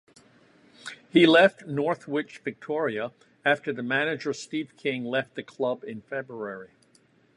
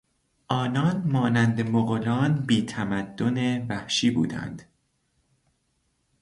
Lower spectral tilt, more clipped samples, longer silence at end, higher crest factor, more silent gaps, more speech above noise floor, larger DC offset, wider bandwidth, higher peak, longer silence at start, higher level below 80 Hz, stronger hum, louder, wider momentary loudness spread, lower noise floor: about the same, -5.5 dB/octave vs -6 dB/octave; neither; second, 0.7 s vs 1.6 s; about the same, 22 dB vs 20 dB; neither; second, 36 dB vs 48 dB; neither; about the same, 11 kHz vs 11.5 kHz; about the same, -4 dBFS vs -6 dBFS; first, 0.85 s vs 0.5 s; second, -76 dBFS vs -58 dBFS; neither; about the same, -26 LUFS vs -25 LUFS; first, 18 LU vs 7 LU; second, -62 dBFS vs -72 dBFS